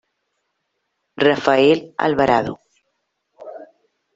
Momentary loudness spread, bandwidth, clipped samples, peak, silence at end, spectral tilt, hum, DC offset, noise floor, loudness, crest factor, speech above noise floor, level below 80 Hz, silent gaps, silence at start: 23 LU; 7.8 kHz; under 0.1%; 0 dBFS; 0.5 s; -6 dB/octave; none; under 0.1%; -74 dBFS; -17 LUFS; 20 dB; 58 dB; -56 dBFS; none; 1.2 s